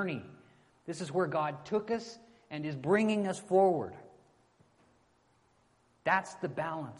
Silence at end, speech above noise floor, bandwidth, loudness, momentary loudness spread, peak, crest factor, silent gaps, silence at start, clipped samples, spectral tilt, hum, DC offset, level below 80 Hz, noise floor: 0 s; 38 dB; 11.5 kHz; -32 LUFS; 19 LU; -14 dBFS; 20 dB; none; 0 s; under 0.1%; -6 dB/octave; none; under 0.1%; -74 dBFS; -70 dBFS